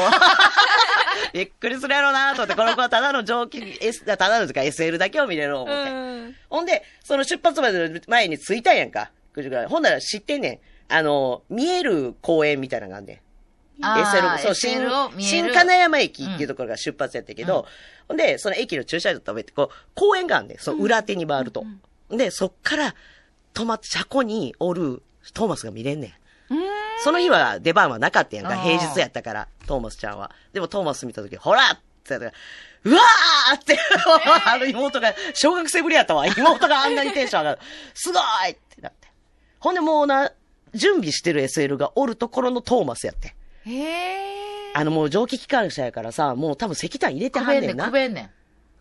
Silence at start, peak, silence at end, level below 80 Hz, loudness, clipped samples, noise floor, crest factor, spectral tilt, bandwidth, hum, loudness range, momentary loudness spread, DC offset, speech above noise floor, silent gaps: 0 s; -2 dBFS; 0.55 s; -52 dBFS; -20 LUFS; under 0.1%; -59 dBFS; 20 dB; -3 dB/octave; 12.5 kHz; none; 8 LU; 15 LU; under 0.1%; 38 dB; none